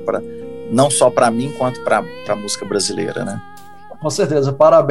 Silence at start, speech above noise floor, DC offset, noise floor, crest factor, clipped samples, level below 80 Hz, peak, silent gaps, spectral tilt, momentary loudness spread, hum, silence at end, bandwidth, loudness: 0 s; 23 dB; 1%; -39 dBFS; 16 dB; under 0.1%; -56 dBFS; 0 dBFS; none; -4.5 dB/octave; 13 LU; none; 0 s; 12.5 kHz; -17 LUFS